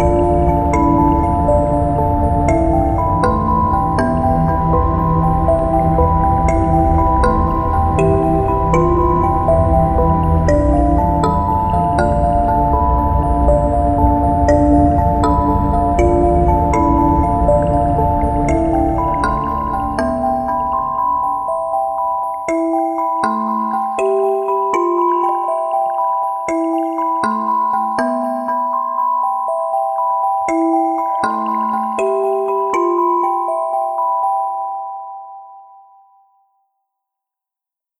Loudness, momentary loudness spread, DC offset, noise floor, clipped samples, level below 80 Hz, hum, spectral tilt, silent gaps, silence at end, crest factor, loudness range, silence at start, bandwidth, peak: -15 LUFS; 5 LU; under 0.1%; -87 dBFS; under 0.1%; -22 dBFS; none; -8.5 dB/octave; none; 2.35 s; 14 dB; 4 LU; 0 s; 12.5 kHz; 0 dBFS